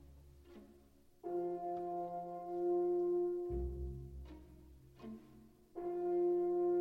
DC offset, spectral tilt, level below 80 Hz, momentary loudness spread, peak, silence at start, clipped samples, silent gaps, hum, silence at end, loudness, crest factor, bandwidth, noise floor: under 0.1%; -10 dB/octave; -54 dBFS; 22 LU; -28 dBFS; 0 s; under 0.1%; none; none; 0 s; -39 LUFS; 12 dB; 3 kHz; -65 dBFS